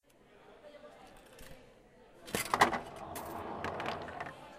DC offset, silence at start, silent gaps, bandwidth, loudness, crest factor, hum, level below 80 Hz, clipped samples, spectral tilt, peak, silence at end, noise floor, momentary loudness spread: under 0.1%; 0.3 s; none; 15.5 kHz; -36 LUFS; 28 dB; none; -64 dBFS; under 0.1%; -3 dB/octave; -10 dBFS; 0 s; -61 dBFS; 26 LU